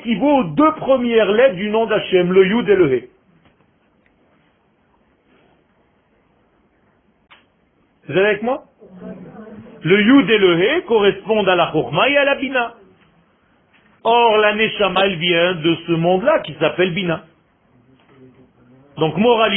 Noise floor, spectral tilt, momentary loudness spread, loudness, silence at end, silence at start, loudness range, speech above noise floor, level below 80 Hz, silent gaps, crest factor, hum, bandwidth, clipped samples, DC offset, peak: -59 dBFS; -10.5 dB/octave; 11 LU; -16 LUFS; 0 s; 0 s; 9 LU; 44 dB; -54 dBFS; none; 16 dB; none; 4 kHz; under 0.1%; under 0.1%; -2 dBFS